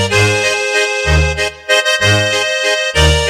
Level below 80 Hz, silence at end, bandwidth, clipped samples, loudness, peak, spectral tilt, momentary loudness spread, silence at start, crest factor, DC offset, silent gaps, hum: -22 dBFS; 0 s; 16 kHz; under 0.1%; -12 LUFS; 0 dBFS; -3 dB/octave; 2 LU; 0 s; 12 dB; under 0.1%; none; none